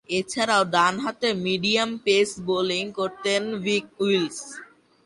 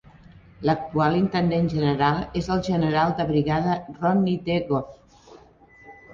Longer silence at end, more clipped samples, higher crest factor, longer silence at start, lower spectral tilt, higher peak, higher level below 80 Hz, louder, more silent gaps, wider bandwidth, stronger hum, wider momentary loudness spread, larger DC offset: first, 0.4 s vs 0 s; neither; about the same, 18 dB vs 18 dB; second, 0.1 s vs 0.6 s; second, -3.5 dB/octave vs -7.5 dB/octave; about the same, -6 dBFS vs -6 dBFS; second, -64 dBFS vs -48 dBFS; about the same, -23 LUFS vs -23 LUFS; neither; first, 11.5 kHz vs 7.4 kHz; neither; about the same, 7 LU vs 5 LU; neither